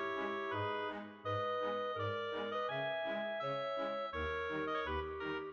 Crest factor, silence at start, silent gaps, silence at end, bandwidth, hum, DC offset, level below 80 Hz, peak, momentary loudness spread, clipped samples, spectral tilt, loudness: 12 dB; 0 s; none; 0 s; 7.2 kHz; none; under 0.1%; -60 dBFS; -28 dBFS; 3 LU; under 0.1%; -6.5 dB/octave; -39 LUFS